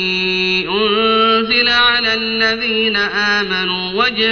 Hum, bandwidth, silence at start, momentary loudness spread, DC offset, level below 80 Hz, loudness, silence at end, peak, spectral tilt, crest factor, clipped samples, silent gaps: none; 6.6 kHz; 0 s; 4 LU; under 0.1%; -46 dBFS; -13 LUFS; 0 s; -2 dBFS; 0 dB/octave; 12 dB; under 0.1%; none